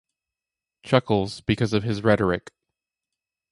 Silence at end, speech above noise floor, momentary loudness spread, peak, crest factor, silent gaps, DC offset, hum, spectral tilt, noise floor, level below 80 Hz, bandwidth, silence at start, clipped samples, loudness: 1.15 s; 67 dB; 5 LU; -4 dBFS; 22 dB; none; under 0.1%; none; -6.5 dB/octave; -89 dBFS; -48 dBFS; 11.5 kHz; 0.85 s; under 0.1%; -23 LUFS